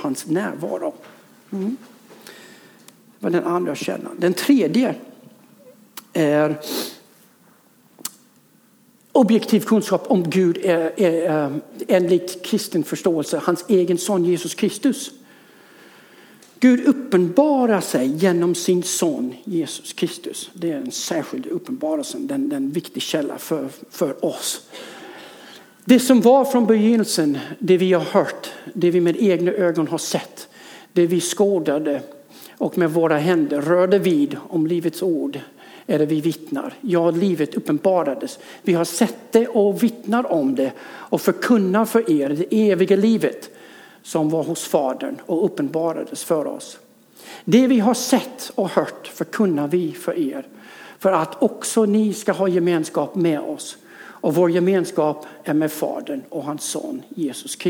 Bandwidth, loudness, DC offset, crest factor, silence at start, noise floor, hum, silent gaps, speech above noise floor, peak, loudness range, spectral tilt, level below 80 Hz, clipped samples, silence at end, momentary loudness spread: over 20 kHz; -20 LUFS; under 0.1%; 20 dB; 0 s; -55 dBFS; none; none; 36 dB; -2 dBFS; 7 LU; -5.5 dB/octave; -74 dBFS; under 0.1%; 0 s; 14 LU